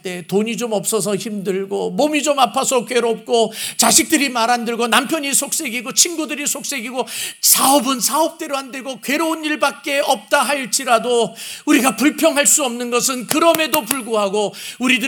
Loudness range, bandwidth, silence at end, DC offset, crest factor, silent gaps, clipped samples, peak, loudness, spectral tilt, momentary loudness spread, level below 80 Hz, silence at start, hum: 3 LU; over 20 kHz; 0 s; under 0.1%; 18 dB; none; under 0.1%; 0 dBFS; -16 LUFS; -2 dB/octave; 10 LU; -68 dBFS; 0.05 s; none